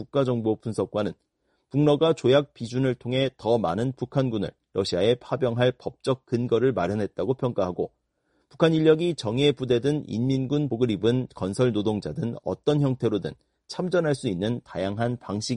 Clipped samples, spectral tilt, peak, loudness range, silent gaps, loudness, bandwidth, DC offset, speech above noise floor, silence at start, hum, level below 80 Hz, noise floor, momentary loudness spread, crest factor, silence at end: under 0.1%; -7 dB/octave; -8 dBFS; 3 LU; none; -25 LUFS; 11 kHz; under 0.1%; 47 dB; 0 s; none; -58 dBFS; -71 dBFS; 9 LU; 18 dB; 0 s